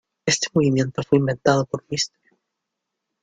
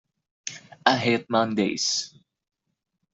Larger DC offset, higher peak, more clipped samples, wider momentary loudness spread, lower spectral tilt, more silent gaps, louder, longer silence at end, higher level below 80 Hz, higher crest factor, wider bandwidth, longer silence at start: neither; about the same, -2 dBFS vs -2 dBFS; neither; second, 7 LU vs 15 LU; first, -4.5 dB/octave vs -3 dB/octave; neither; first, -21 LUFS vs -24 LUFS; about the same, 1.15 s vs 1.05 s; first, -58 dBFS vs -68 dBFS; about the same, 20 dB vs 24 dB; first, 9.6 kHz vs 7.8 kHz; second, 0.25 s vs 0.45 s